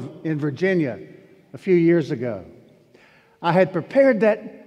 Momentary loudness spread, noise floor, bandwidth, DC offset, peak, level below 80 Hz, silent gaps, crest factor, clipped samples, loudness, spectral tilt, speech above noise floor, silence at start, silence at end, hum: 13 LU; -54 dBFS; 8.6 kHz; under 0.1%; -4 dBFS; -68 dBFS; none; 18 dB; under 0.1%; -20 LUFS; -8.5 dB/octave; 34 dB; 0 s; 0.1 s; none